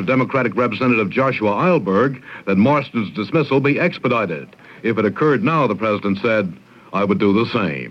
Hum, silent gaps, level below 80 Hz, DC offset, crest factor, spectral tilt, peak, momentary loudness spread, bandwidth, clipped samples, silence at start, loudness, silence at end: none; none; -62 dBFS; under 0.1%; 14 dB; -8.5 dB/octave; -4 dBFS; 7 LU; 7 kHz; under 0.1%; 0 s; -18 LUFS; 0 s